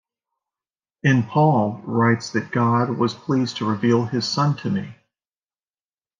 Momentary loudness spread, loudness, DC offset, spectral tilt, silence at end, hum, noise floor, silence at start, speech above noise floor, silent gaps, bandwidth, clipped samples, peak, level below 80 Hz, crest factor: 6 LU; -21 LUFS; under 0.1%; -6.5 dB/octave; 1.25 s; none; under -90 dBFS; 1.05 s; over 70 dB; none; 7.6 kHz; under 0.1%; -4 dBFS; -66 dBFS; 18 dB